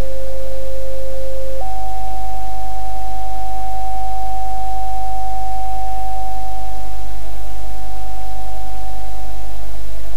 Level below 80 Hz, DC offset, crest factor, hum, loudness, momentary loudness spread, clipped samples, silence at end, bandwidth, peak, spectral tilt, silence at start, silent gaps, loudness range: -30 dBFS; 50%; 10 dB; none; -28 LUFS; 7 LU; under 0.1%; 0 s; 16 kHz; -4 dBFS; -5.5 dB/octave; 0 s; none; 5 LU